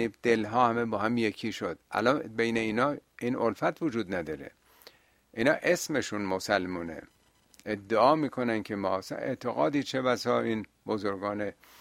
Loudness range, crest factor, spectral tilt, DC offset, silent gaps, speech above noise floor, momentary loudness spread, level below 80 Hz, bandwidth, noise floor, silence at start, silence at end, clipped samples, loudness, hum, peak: 3 LU; 20 dB; -5 dB/octave; under 0.1%; none; 32 dB; 11 LU; -66 dBFS; 16 kHz; -62 dBFS; 0 s; 0.3 s; under 0.1%; -29 LUFS; none; -8 dBFS